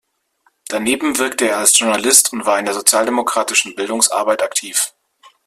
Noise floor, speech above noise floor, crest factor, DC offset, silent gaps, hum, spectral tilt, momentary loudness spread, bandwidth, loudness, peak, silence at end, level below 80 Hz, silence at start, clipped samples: -61 dBFS; 45 dB; 18 dB; under 0.1%; none; none; -0.5 dB/octave; 8 LU; 16 kHz; -14 LUFS; 0 dBFS; 0.6 s; -60 dBFS; 0.7 s; under 0.1%